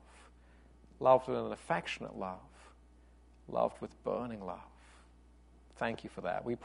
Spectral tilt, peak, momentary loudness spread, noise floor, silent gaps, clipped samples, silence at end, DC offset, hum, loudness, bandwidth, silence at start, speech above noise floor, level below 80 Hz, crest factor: -6 dB/octave; -12 dBFS; 16 LU; -61 dBFS; none; under 0.1%; 0 s; under 0.1%; 60 Hz at -60 dBFS; -36 LUFS; 10.5 kHz; 0.15 s; 26 dB; -62 dBFS; 26 dB